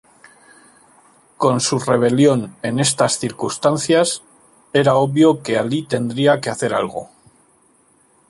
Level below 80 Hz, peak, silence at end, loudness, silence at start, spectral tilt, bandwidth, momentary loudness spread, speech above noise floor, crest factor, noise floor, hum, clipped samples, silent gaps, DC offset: -60 dBFS; -2 dBFS; 1.25 s; -17 LUFS; 1.4 s; -4.5 dB/octave; 11.5 kHz; 8 LU; 39 dB; 16 dB; -56 dBFS; none; under 0.1%; none; under 0.1%